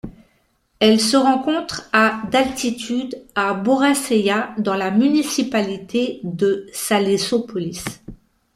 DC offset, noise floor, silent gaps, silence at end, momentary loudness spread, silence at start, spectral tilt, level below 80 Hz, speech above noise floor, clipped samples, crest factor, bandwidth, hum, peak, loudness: under 0.1%; -63 dBFS; none; 0.4 s; 10 LU; 0.05 s; -4 dB/octave; -52 dBFS; 44 dB; under 0.1%; 18 dB; 15.5 kHz; none; -2 dBFS; -19 LUFS